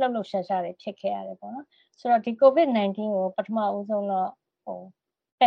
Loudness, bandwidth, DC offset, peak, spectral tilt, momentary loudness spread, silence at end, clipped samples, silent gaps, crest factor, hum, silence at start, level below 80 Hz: -25 LUFS; 6.2 kHz; under 0.1%; -6 dBFS; -7.5 dB/octave; 20 LU; 0 s; under 0.1%; 5.32-5.38 s; 20 dB; none; 0 s; -80 dBFS